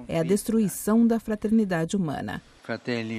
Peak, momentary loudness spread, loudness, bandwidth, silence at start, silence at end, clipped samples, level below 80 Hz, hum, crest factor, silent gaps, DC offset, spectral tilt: -12 dBFS; 13 LU; -25 LUFS; 15.5 kHz; 0 s; 0 s; under 0.1%; -54 dBFS; none; 14 dB; none; under 0.1%; -6 dB/octave